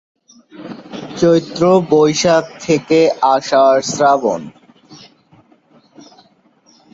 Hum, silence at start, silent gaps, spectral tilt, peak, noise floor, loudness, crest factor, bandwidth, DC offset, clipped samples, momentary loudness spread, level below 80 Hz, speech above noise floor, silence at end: none; 0.6 s; none; -5 dB/octave; 0 dBFS; -53 dBFS; -13 LUFS; 16 dB; 8 kHz; under 0.1%; under 0.1%; 19 LU; -56 dBFS; 40 dB; 2 s